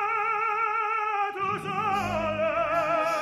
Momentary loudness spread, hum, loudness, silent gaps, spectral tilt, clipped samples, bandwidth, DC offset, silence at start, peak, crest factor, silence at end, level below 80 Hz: 3 LU; none; -26 LUFS; none; -5 dB/octave; under 0.1%; 13.5 kHz; under 0.1%; 0 s; -14 dBFS; 12 dB; 0 s; -54 dBFS